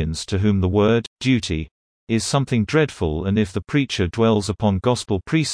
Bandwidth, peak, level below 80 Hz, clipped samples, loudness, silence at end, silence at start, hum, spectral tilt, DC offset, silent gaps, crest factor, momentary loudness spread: 10.5 kHz; -4 dBFS; -40 dBFS; under 0.1%; -20 LUFS; 0 s; 0 s; none; -6 dB/octave; under 0.1%; 1.07-1.16 s, 1.71-2.07 s; 16 dB; 6 LU